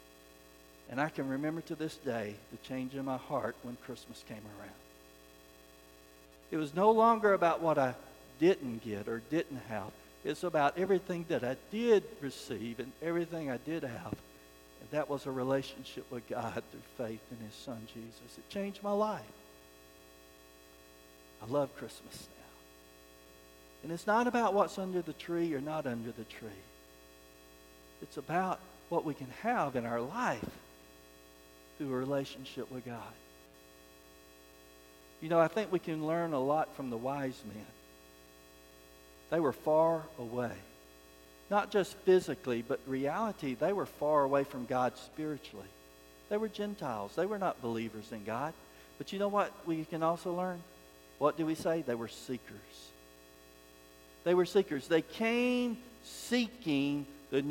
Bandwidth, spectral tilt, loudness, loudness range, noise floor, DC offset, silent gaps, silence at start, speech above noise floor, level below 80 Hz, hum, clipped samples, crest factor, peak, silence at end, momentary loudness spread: 17 kHz; -6 dB/octave; -34 LUFS; 10 LU; -58 dBFS; under 0.1%; none; 0.55 s; 24 dB; -66 dBFS; none; under 0.1%; 22 dB; -14 dBFS; 0 s; 19 LU